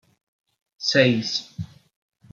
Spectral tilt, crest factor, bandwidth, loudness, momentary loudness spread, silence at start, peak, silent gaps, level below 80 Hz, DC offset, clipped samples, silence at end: -4.5 dB/octave; 22 dB; 7.6 kHz; -21 LUFS; 19 LU; 0.8 s; -4 dBFS; none; -64 dBFS; under 0.1%; under 0.1%; 0.65 s